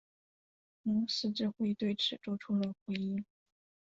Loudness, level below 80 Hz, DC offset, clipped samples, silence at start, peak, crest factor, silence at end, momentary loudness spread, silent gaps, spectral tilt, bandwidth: -35 LUFS; -74 dBFS; under 0.1%; under 0.1%; 0.85 s; -22 dBFS; 16 dB; 0.75 s; 8 LU; 2.81-2.86 s; -5 dB/octave; 7.6 kHz